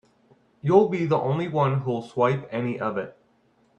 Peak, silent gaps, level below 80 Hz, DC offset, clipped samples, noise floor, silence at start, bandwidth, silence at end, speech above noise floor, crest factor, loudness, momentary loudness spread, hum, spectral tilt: -4 dBFS; none; -66 dBFS; under 0.1%; under 0.1%; -63 dBFS; 0.65 s; 8.2 kHz; 0.65 s; 40 dB; 20 dB; -24 LUFS; 10 LU; none; -8.5 dB/octave